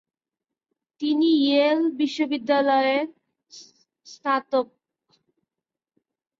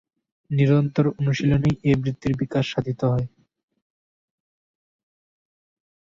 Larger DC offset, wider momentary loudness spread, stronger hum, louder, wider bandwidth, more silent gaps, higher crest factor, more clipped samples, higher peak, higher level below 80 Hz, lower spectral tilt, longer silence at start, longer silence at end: neither; first, 11 LU vs 7 LU; neither; about the same, -22 LUFS vs -22 LUFS; about the same, 7.6 kHz vs 7.4 kHz; neither; about the same, 16 dB vs 18 dB; neither; about the same, -8 dBFS vs -6 dBFS; second, -74 dBFS vs -48 dBFS; second, -4 dB/octave vs -8 dB/octave; first, 1 s vs 0.5 s; second, 1.75 s vs 2.75 s